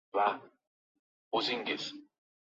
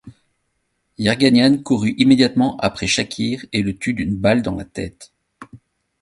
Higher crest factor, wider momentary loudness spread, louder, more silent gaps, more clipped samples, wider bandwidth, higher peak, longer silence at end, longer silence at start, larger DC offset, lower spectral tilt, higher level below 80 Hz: about the same, 20 dB vs 18 dB; about the same, 12 LU vs 12 LU; second, -34 LUFS vs -17 LUFS; first, 0.67-1.31 s vs none; neither; second, 7.6 kHz vs 11.5 kHz; second, -16 dBFS vs 0 dBFS; about the same, 0.4 s vs 0.45 s; about the same, 0.15 s vs 0.05 s; neither; second, 0 dB/octave vs -5 dB/octave; second, -84 dBFS vs -46 dBFS